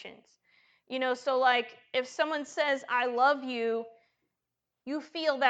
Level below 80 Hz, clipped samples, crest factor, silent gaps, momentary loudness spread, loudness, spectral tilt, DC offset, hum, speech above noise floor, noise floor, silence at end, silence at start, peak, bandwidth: -86 dBFS; under 0.1%; 22 dB; none; 13 LU; -30 LUFS; -2 dB/octave; under 0.1%; none; 57 dB; -87 dBFS; 0 s; 0 s; -10 dBFS; 9 kHz